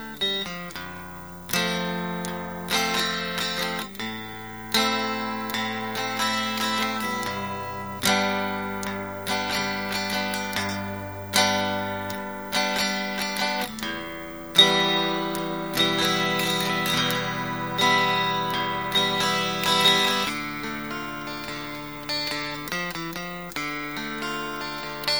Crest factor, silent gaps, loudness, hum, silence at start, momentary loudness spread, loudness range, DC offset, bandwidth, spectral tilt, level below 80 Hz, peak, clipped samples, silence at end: 24 dB; none; -25 LUFS; none; 0 s; 12 LU; 6 LU; 0.2%; over 20 kHz; -3 dB/octave; -56 dBFS; -2 dBFS; under 0.1%; 0 s